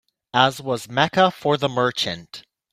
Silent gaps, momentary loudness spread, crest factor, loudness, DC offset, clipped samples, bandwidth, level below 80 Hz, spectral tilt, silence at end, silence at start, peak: none; 14 LU; 20 dB; -20 LUFS; under 0.1%; under 0.1%; 16 kHz; -60 dBFS; -4.5 dB/octave; 0.35 s; 0.35 s; 0 dBFS